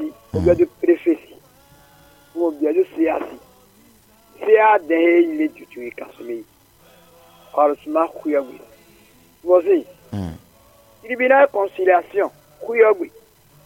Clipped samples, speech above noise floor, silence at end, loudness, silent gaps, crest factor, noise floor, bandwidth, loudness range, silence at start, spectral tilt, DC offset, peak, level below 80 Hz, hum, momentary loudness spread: under 0.1%; 35 dB; 0.55 s; -18 LUFS; none; 18 dB; -52 dBFS; 16.5 kHz; 6 LU; 0 s; -7.5 dB/octave; under 0.1%; -2 dBFS; -50 dBFS; none; 18 LU